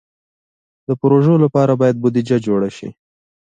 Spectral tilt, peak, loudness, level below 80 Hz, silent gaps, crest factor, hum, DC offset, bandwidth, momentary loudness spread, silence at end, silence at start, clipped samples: -9 dB/octave; -2 dBFS; -15 LUFS; -58 dBFS; none; 14 dB; none; under 0.1%; 9.2 kHz; 18 LU; 0.65 s; 0.9 s; under 0.1%